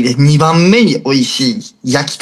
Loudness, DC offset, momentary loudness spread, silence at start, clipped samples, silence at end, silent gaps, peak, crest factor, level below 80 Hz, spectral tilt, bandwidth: -11 LUFS; under 0.1%; 8 LU; 0 s; under 0.1%; 0.05 s; none; 0 dBFS; 10 dB; -52 dBFS; -5.5 dB/octave; 12.5 kHz